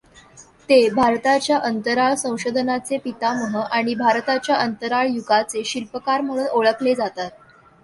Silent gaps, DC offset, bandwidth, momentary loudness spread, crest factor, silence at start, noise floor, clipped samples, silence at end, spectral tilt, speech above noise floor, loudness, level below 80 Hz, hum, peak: none; under 0.1%; 11.5 kHz; 8 LU; 18 dB; 0.35 s; -48 dBFS; under 0.1%; 0.55 s; -3.5 dB/octave; 28 dB; -20 LUFS; -60 dBFS; none; -4 dBFS